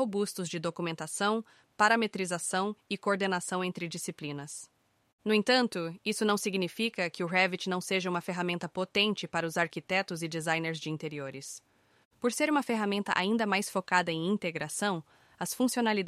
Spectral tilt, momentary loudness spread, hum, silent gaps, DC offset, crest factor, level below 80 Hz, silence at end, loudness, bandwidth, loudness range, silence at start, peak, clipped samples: -4 dB/octave; 10 LU; none; 5.13-5.18 s, 12.05-12.11 s; under 0.1%; 20 dB; -76 dBFS; 0 s; -31 LUFS; 15.5 kHz; 3 LU; 0 s; -10 dBFS; under 0.1%